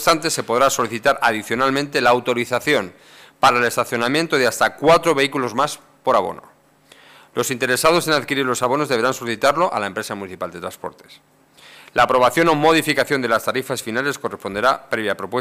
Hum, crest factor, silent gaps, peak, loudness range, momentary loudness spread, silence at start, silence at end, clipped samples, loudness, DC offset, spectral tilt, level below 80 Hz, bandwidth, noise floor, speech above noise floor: none; 14 dB; none; -4 dBFS; 3 LU; 12 LU; 0 s; 0 s; under 0.1%; -18 LUFS; under 0.1%; -3.5 dB/octave; -54 dBFS; 16 kHz; -51 dBFS; 32 dB